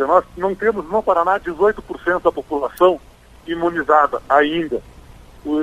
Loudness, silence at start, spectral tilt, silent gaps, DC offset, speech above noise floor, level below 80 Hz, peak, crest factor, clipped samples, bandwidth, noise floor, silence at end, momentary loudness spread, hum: -18 LUFS; 0 s; -6 dB/octave; none; under 0.1%; 24 dB; -46 dBFS; 0 dBFS; 18 dB; under 0.1%; 13 kHz; -42 dBFS; 0 s; 9 LU; none